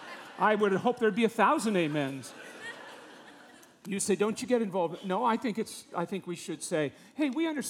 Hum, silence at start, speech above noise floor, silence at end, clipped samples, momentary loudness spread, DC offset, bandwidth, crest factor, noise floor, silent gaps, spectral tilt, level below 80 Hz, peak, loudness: none; 0 s; 25 dB; 0 s; under 0.1%; 18 LU; under 0.1%; 17 kHz; 20 dB; -55 dBFS; none; -4.5 dB/octave; -80 dBFS; -10 dBFS; -30 LUFS